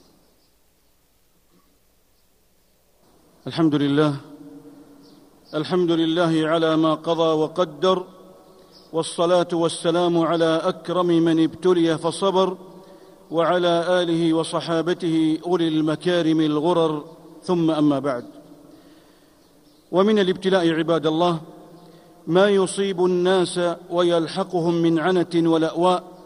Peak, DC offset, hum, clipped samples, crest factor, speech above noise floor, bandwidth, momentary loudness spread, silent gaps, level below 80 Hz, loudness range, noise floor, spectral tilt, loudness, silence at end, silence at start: -4 dBFS; under 0.1%; none; under 0.1%; 18 dB; 41 dB; 11 kHz; 6 LU; none; -64 dBFS; 5 LU; -60 dBFS; -6 dB/octave; -21 LUFS; 0.1 s; 3.45 s